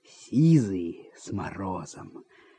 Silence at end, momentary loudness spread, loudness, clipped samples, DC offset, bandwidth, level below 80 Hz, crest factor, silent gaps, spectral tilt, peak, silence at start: 0.35 s; 22 LU; -27 LUFS; under 0.1%; under 0.1%; 9.2 kHz; -64 dBFS; 18 dB; none; -8 dB/octave; -10 dBFS; 0.2 s